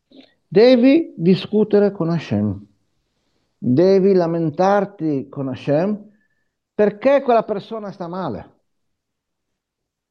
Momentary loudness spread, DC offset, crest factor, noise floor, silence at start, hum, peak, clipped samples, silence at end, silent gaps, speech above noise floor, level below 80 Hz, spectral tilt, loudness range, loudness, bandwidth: 15 LU; under 0.1%; 18 dB; -80 dBFS; 0.5 s; none; 0 dBFS; under 0.1%; 1.7 s; none; 64 dB; -64 dBFS; -8.5 dB/octave; 5 LU; -17 LUFS; 6.6 kHz